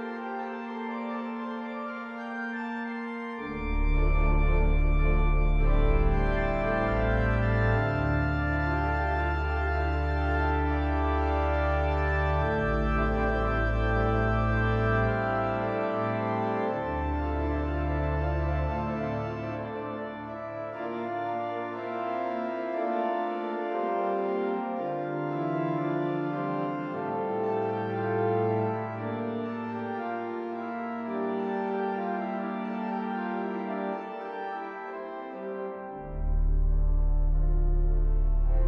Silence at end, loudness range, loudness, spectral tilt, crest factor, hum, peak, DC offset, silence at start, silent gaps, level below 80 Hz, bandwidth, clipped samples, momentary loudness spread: 0 s; 7 LU; -30 LUFS; -9 dB/octave; 14 dB; none; -12 dBFS; under 0.1%; 0 s; none; -30 dBFS; 5.6 kHz; under 0.1%; 9 LU